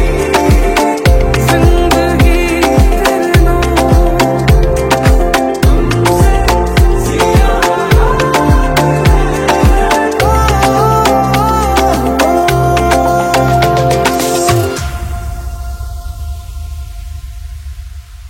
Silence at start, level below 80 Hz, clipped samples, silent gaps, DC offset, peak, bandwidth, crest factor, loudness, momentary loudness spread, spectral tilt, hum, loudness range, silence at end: 0 s; -14 dBFS; 0.1%; none; under 0.1%; 0 dBFS; 17 kHz; 10 dB; -10 LUFS; 15 LU; -5.5 dB/octave; none; 5 LU; 0 s